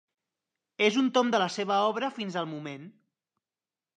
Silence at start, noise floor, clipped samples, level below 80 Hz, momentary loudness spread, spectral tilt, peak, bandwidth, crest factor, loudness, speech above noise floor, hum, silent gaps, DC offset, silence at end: 0.8 s; under -90 dBFS; under 0.1%; -84 dBFS; 16 LU; -4.5 dB/octave; -10 dBFS; 9.6 kHz; 20 dB; -27 LUFS; over 62 dB; none; none; under 0.1%; 1.1 s